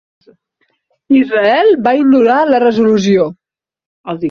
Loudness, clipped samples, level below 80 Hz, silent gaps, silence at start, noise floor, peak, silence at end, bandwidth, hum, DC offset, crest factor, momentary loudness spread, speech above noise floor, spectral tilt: -11 LUFS; under 0.1%; -56 dBFS; 3.86-4.04 s; 1.1 s; -63 dBFS; -2 dBFS; 0 s; 7 kHz; none; under 0.1%; 12 dB; 10 LU; 54 dB; -6.5 dB/octave